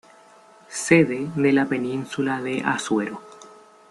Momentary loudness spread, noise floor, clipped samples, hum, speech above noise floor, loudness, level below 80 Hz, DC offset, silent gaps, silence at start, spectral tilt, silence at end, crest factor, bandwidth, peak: 13 LU; -51 dBFS; under 0.1%; none; 29 dB; -22 LUFS; -66 dBFS; under 0.1%; none; 0.7 s; -5 dB/octave; 0.4 s; 22 dB; 12 kHz; -2 dBFS